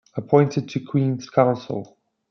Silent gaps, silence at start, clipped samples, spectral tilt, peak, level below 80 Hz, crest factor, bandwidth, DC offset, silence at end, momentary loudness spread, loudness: none; 0.15 s; under 0.1%; -8 dB/octave; -2 dBFS; -66 dBFS; 20 dB; 6.6 kHz; under 0.1%; 0.45 s; 11 LU; -21 LUFS